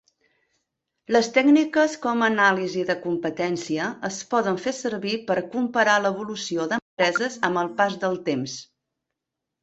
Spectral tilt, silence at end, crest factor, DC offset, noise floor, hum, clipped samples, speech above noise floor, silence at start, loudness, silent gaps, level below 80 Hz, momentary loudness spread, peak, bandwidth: -4 dB/octave; 1 s; 18 dB; under 0.1%; -84 dBFS; none; under 0.1%; 62 dB; 1.1 s; -23 LUFS; 6.82-6.97 s; -68 dBFS; 9 LU; -6 dBFS; 8.2 kHz